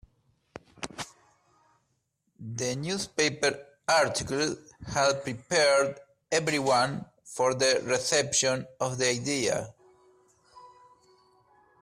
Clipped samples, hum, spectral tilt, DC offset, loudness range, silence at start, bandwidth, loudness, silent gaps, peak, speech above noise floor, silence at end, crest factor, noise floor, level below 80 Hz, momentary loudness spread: under 0.1%; none; -2.5 dB/octave; under 0.1%; 6 LU; 0.8 s; 14.5 kHz; -27 LUFS; none; -12 dBFS; 49 dB; 1.15 s; 18 dB; -76 dBFS; -62 dBFS; 17 LU